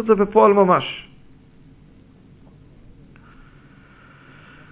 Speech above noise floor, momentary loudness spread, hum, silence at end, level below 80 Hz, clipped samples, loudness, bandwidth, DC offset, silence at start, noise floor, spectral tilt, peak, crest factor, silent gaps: 33 dB; 17 LU; none; 3.7 s; -54 dBFS; under 0.1%; -16 LUFS; 4 kHz; under 0.1%; 0 s; -48 dBFS; -10.5 dB/octave; -2 dBFS; 20 dB; none